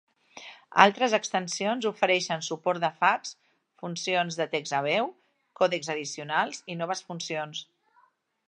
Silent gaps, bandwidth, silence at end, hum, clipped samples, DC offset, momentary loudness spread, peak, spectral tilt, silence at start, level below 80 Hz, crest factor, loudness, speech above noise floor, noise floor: none; 10.5 kHz; 0.85 s; none; under 0.1%; under 0.1%; 14 LU; 0 dBFS; -3 dB/octave; 0.35 s; -80 dBFS; 28 dB; -27 LUFS; 38 dB; -65 dBFS